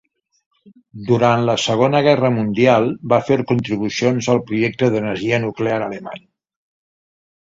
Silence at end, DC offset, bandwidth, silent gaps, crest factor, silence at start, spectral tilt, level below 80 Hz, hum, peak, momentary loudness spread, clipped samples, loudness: 1.25 s; under 0.1%; 7.8 kHz; none; 18 dB; 0.95 s; -6 dB/octave; -54 dBFS; none; 0 dBFS; 8 LU; under 0.1%; -17 LUFS